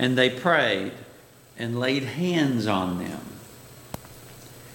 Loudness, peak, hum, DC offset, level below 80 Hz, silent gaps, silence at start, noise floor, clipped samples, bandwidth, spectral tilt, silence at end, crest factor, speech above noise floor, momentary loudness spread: -24 LUFS; -6 dBFS; none; under 0.1%; -60 dBFS; none; 0 s; -50 dBFS; under 0.1%; 17 kHz; -5.5 dB/octave; 0 s; 20 dB; 26 dB; 23 LU